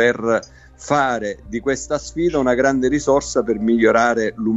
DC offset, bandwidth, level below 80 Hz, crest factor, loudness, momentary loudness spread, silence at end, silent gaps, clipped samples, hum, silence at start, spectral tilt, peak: 0.1%; 8.2 kHz; -44 dBFS; 16 dB; -18 LUFS; 9 LU; 0 s; none; under 0.1%; none; 0 s; -5 dB/octave; -2 dBFS